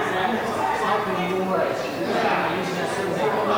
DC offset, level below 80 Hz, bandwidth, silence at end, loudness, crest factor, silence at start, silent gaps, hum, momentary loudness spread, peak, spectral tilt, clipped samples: under 0.1%; -56 dBFS; over 20 kHz; 0 s; -23 LUFS; 14 dB; 0 s; none; none; 3 LU; -10 dBFS; -5 dB/octave; under 0.1%